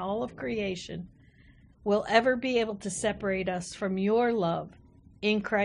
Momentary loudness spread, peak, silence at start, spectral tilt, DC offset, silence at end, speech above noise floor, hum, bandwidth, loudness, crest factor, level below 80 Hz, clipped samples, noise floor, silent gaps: 13 LU; -8 dBFS; 0 s; -5 dB/octave; under 0.1%; 0 s; 29 dB; none; 10.5 kHz; -29 LUFS; 20 dB; -58 dBFS; under 0.1%; -57 dBFS; none